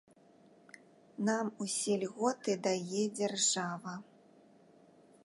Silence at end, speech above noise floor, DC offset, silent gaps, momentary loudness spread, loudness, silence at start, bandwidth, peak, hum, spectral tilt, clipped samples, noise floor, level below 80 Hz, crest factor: 1.2 s; 29 dB; under 0.1%; none; 12 LU; -34 LUFS; 1.2 s; 11.5 kHz; -16 dBFS; none; -3 dB/octave; under 0.1%; -63 dBFS; -86 dBFS; 20 dB